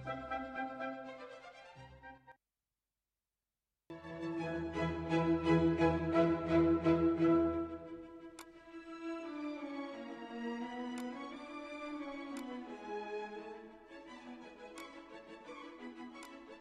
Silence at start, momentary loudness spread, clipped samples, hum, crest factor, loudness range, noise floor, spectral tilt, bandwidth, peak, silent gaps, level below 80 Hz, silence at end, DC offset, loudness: 0 s; 22 LU; under 0.1%; none; 20 dB; 17 LU; under -90 dBFS; -7.5 dB/octave; 9.6 kHz; -18 dBFS; none; -60 dBFS; 0 s; under 0.1%; -37 LUFS